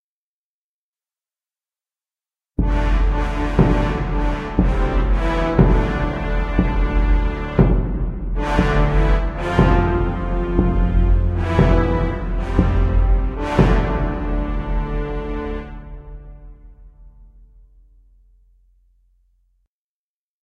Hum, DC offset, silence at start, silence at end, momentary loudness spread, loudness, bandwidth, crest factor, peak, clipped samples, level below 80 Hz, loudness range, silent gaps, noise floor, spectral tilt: none; under 0.1%; 2.6 s; 3.35 s; 9 LU; -20 LUFS; 6.6 kHz; 18 dB; 0 dBFS; under 0.1%; -22 dBFS; 9 LU; none; under -90 dBFS; -8.5 dB/octave